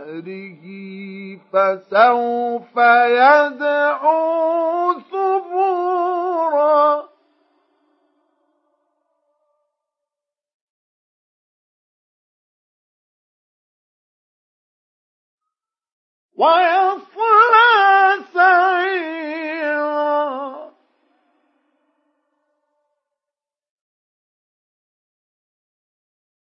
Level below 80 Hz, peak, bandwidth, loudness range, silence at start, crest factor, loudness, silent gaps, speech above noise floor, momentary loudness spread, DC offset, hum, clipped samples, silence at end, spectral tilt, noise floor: -90 dBFS; -2 dBFS; 6 kHz; 11 LU; 0 s; 18 dB; -16 LUFS; 10.54-15.38 s, 15.92-16.29 s; 73 dB; 20 LU; under 0.1%; none; under 0.1%; 5.85 s; -5.5 dB/octave; -88 dBFS